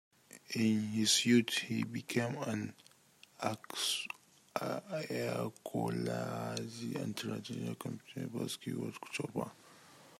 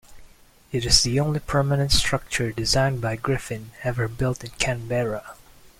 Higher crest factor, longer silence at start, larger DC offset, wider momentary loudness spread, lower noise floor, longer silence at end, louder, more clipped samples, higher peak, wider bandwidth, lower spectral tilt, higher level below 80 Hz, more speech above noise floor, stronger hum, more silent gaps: about the same, 20 dB vs 22 dB; first, 0.35 s vs 0.1 s; neither; first, 14 LU vs 11 LU; first, -64 dBFS vs -50 dBFS; second, 0.05 s vs 0.45 s; second, -36 LUFS vs -23 LUFS; neither; second, -16 dBFS vs -2 dBFS; about the same, 16 kHz vs 16 kHz; about the same, -4 dB/octave vs -4 dB/octave; second, -78 dBFS vs -38 dBFS; about the same, 28 dB vs 27 dB; neither; neither